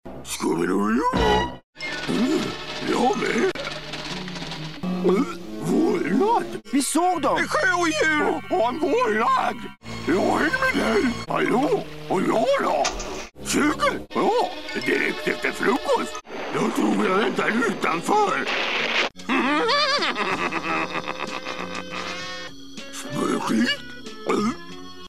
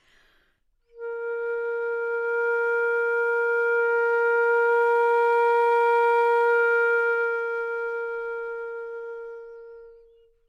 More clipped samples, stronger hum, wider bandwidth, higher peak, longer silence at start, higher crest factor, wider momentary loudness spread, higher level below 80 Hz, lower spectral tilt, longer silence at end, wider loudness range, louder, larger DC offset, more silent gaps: neither; neither; first, 15 kHz vs 6 kHz; first, -6 dBFS vs -14 dBFS; second, 0 s vs 0.95 s; first, 16 dB vs 10 dB; second, 11 LU vs 15 LU; first, -46 dBFS vs -68 dBFS; first, -4 dB/octave vs -1.5 dB/octave; second, 0 s vs 0.55 s; second, 4 LU vs 7 LU; about the same, -23 LUFS vs -23 LUFS; first, 1% vs under 0.1%; first, 1.63-1.73 s vs none